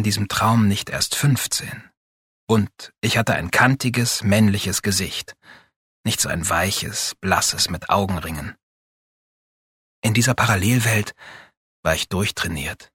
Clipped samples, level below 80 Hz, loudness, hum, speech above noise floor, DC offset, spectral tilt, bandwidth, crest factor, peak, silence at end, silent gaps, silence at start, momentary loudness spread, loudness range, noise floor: under 0.1%; -46 dBFS; -20 LUFS; none; over 69 dB; under 0.1%; -4 dB/octave; 17 kHz; 20 dB; -2 dBFS; 0.1 s; 1.97-2.47 s, 5.76-6.04 s, 8.63-10.02 s, 11.57-11.83 s; 0 s; 11 LU; 3 LU; under -90 dBFS